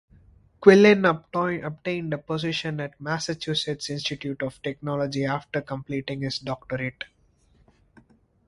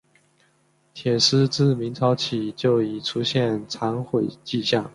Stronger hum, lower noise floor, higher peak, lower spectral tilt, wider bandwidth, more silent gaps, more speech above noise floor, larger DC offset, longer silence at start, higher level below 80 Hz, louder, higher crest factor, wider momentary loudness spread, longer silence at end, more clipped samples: neither; about the same, -61 dBFS vs -63 dBFS; first, 0 dBFS vs -6 dBFS; about the same, -5.5 dB/octave vs -5.5 dB/octave; about the same, 11.5 kHz vs 11.5 kHz; neither; second, 37 dB vs 41 dB; neither; second, 0.6 s vs 0.95 s; about the same, -60 dBFS vs -62 dBFS; about the same, -24 LUFS vs -22 LUFS; first, 24 dB vs 18 dB; first, 14 LU vs 8 LU; first, 1.4 s vs 0.05 s; neither